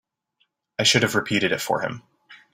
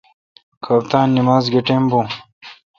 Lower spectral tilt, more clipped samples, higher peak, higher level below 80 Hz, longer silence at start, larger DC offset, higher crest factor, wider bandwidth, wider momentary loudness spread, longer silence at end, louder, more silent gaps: second, -3 dB/octave vs -7.5 dB/octave; neither; second, -4 dBFS vs 0 dBFS; about the same, -60 dBFS vs -56 dBFS; first, 0.8 s vs 0.65 s; neither; about the same, 20 dB vs 18 dB; first, 16 kHz vs 7 kHz; about the same, 15 LU vs 13 LU; about the same, 0.2 s vs 0.25 s; second, -21 LUFS vs -16 LUFS; second, none vs 2.33-2.41 s